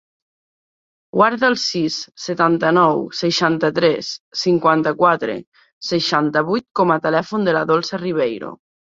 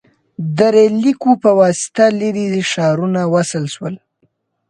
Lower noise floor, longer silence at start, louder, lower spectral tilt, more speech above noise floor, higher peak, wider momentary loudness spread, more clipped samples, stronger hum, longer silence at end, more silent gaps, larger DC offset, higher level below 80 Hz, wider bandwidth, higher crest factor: first, under -90 dBFS vs -63 dBFS; first, 1.15 s vs 0.4 s; second, -18 LUFS vs -14 LUFS; about the same, -5 dB/octave vs -5.5 dB/octave; first, over 72 dB vs 49 dB; about the same, -2 dBFS vs 0 dBFS; about the same, 11 LU vs 13 LU; neither; neither; second, 0.45 s vs 0.75 s; first, 4.20-4.31 s, 5.47-5.52 s, 5.73-5.81 s, 6.71-6.75 s vs none; neither; about the same, -62 dBFS vs -60 dBFS; second, 7.8 kHz vs 11.5 kHz; about the same, 18 dB vs 14 dB